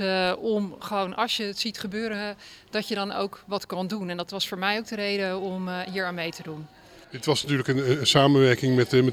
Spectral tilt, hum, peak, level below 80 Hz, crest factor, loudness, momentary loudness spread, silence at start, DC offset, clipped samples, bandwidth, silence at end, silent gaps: -5 dB/octave; none; -6 dBFS; -60 dBFS; 20 dB; -26 LUFS; 12 LU; 0 s; under 0.1%; under 0.1%; 16.5 kHz; 0 s; none